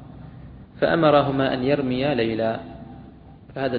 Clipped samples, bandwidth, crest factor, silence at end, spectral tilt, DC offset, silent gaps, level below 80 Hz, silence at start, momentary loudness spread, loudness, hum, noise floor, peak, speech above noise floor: under 0.1%; 5 kHz; 20 dB; 0 s; -10 dB/octave; under 0.1%; none; -48 dBFS; 0 s; 24 LU; -21 LUFS; none; -45 dBFS; -4 dBFS; 24 dB